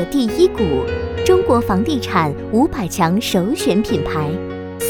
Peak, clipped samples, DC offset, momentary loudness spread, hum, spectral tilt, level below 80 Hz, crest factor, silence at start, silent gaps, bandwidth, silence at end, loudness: -2 dBFS; under 0.1%; under 0.1%; 6 LU; none; -5.5 dB/octave; -36 dBFS; 16 dB; 0 s; none; 19.5 kHz; 0 s; -17 LUFS